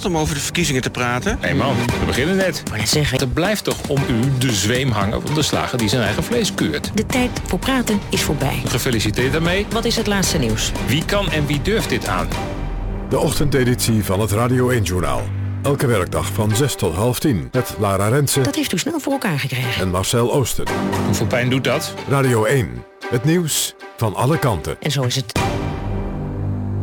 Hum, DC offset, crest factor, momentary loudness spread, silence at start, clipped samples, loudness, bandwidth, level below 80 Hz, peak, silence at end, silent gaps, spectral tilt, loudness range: none; under 0.1%; 12 dB; 5 LU; 0 s; under 0.1%; -19 LUFS; 20 kHz; -32 dBFS; -6 dBFS; 0 s; none; -4.5 dB/octave; 1 LU